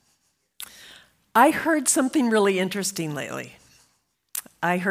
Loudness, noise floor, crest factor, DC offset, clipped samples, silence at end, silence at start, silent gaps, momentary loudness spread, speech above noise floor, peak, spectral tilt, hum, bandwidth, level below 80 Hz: -23 LUFS; -69 dBFS; 20 dB; under 0.1%; under 0.1%; 0 s; 0.6 s; none; 21 LU; 48 dB; -4 dBFS; -3.5 dB/octave; none; 16 kHz; -70 dBFS